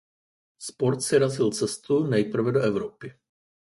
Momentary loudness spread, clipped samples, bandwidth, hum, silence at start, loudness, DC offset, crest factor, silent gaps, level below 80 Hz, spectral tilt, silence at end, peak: 17 LU; under 0.1%; 11.5 kHz; none; 0.6 s; -25 LUFS; under 0.1%; 18 dB; none; -64 dBFS; -5.5 dB/octave; 0.65 s; -8 dBFS